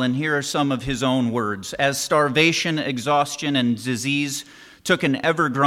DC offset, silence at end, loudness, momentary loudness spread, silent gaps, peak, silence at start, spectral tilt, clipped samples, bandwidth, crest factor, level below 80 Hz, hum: under 0.1%; 0 s; -21 LUFS; 6 LU; none; -4 dBFS; 0 s; -4 dB/octave; under 0.1%; 16 kHz; 18 dB; -50 dBFS; none